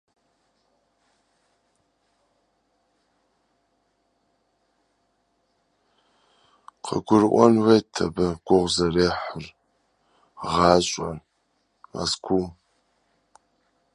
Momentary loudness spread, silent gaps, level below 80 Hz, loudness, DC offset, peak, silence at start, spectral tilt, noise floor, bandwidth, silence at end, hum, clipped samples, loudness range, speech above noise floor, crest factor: 20 LU; none; -50 dBFS; -22 LUFS; under 0.1%; -2 dBFS; 6.85 s; -5 dB/octave; -71 dBFS; 11.5 kHz; 1.4 s; none; under 0.1%; 6 LU; 50 dB; 26 dB